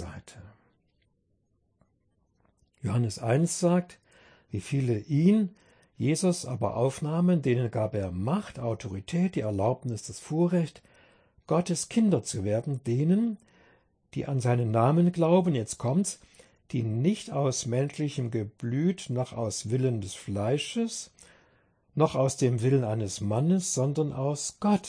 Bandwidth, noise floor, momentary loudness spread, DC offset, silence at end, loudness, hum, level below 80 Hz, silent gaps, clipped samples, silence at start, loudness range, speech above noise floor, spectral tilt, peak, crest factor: 10.5 kHz; -72 dBFS; 10 LU; under 0.1%; 0 s; -28 LUFS; none; -62 dBFS; none; under 0.1%; 0 s; 4 LU; 45 dB; -6.5 dB/octave; -10 dBFS; 18 dB